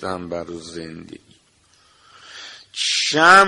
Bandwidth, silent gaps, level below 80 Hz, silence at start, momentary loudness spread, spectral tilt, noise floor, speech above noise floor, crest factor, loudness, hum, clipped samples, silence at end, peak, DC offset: 11.5 kHz; none; -58 dBFS; 0 s; 24 LU; -2 dB/octave; -57 dBFS; 40 dB; 20 dB; -18 LUFS; none; under 0.1%; 0 s; 0 dBFS; under 0.1%